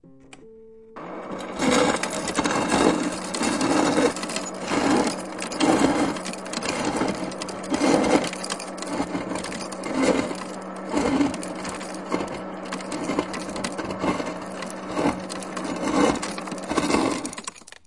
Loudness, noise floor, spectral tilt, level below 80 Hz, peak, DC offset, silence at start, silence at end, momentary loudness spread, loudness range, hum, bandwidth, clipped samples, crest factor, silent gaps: -25 LUFS; -48 dBFS; -4 dB/octave; -52 dBFS; -4 dBFS; 0.2%; 0.05 s; 0.3 s; 12 LU; 6 LU; none; 11.5 kHz; under 0.1%; 22 dB; none